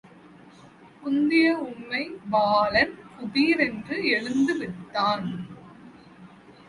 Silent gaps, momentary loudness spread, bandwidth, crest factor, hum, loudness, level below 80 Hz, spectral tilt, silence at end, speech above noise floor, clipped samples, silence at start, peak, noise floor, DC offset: none; 14 LU; 11.5 kHz; 18 dB; none; -24 LUFS; -60 dBFS; -5.5 dB/octave; 0.15 s; 26 dB; under 0.1%; 0.65 s; -8 dBFS; -50 dBFS; under 0.1%